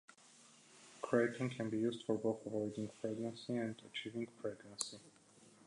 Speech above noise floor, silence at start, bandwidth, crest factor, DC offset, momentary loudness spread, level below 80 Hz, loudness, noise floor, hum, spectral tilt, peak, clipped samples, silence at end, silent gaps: 25 dB; 0.4 s; 11 kHz; 24 dB; under 0.1%; 24 LU; -82 dBFS; -41 LUFS; -65 dBFS; none; -5 dB/octave; -18 dBFS; under 0.1%; 0.2 s; none